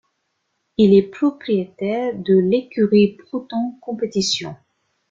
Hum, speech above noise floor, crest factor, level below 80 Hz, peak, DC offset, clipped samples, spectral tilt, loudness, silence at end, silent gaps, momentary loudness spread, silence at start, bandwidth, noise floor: none; 54 dB; 16 dB; -58 dBFS; -2 dBFS; under 0.1%; under 0.1%; -6 dB/octave; -19 LUFS; 0.55 s; none; 12 LU; 0.8 s; 7.8 kHz; -72 dBFS